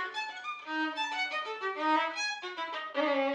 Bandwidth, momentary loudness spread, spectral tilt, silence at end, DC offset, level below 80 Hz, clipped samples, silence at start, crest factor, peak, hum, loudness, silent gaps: 10 kHz; 8 LU; -0.5 dB/octave; 0 s; under 0.1%; under -90 dBFS; under 0.1%; 0 s; 16 dB; -16 dBFS; none; -33 LUFS; none